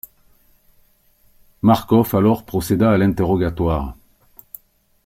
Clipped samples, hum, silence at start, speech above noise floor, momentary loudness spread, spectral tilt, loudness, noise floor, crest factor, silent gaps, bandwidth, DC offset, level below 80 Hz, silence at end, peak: under 0.1%; none; 1.65 s; 40 dB; 24 LU; -7.5 dB/octave; -18 LUFS; -56 dBFS; 16 dB; none; 16.5 kHz; under 0.1%; -38 dBFS; 1.1 s; -4 dBFS